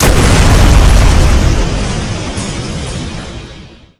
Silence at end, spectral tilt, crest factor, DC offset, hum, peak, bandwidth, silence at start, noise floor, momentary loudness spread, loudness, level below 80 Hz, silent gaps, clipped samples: 0.25 s; -5 dB/octave; 10 dB; under 0.1%; none; 0 dBFS; 14 kHz; 0 s; -33 dBFS; 16 LU; -11 LUFS; -12 dBFS; none; 1%